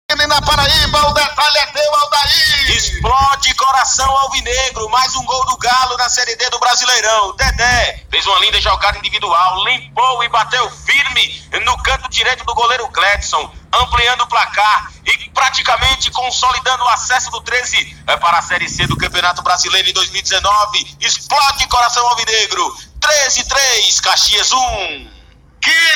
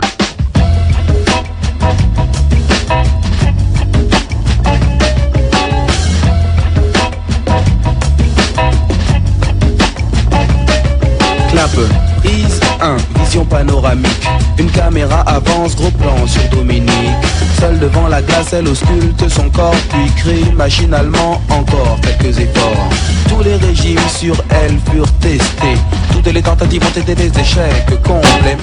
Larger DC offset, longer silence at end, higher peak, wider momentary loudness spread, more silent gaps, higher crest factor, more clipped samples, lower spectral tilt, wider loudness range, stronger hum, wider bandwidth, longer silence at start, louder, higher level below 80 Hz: neither; about the same, 0 s vs 0 s; about the same, 0 dBFS vs 0 dBFS; first, 6 LU vs 2 LU; neither; about the same, 14 dB vs 10 dB; neither; second, -0.5 dB/octave vs -5.5 dB/octave; about the same, 2 LU vs 1 LU; neither; first, 17.5 kHz vs 11 kHz; about the same, 0.1 s vs 0 s; about the same, -12 LUFS vs -11 LUFS; second, -30 dBFS vs -14 dBFS